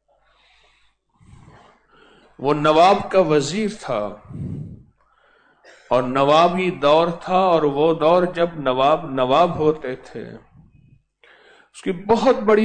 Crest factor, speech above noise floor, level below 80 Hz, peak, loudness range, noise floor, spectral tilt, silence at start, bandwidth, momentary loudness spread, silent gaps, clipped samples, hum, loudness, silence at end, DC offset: 16 dB; 43 dB; -52 dBFS; -4 dBFS; 5 LU; -61 dBFS; -6 dB/octave; 2.4 s; 9.4 kHz; 17 LU; none; under 0.1%; none; -18 LUFS; 0 s; under 0.1%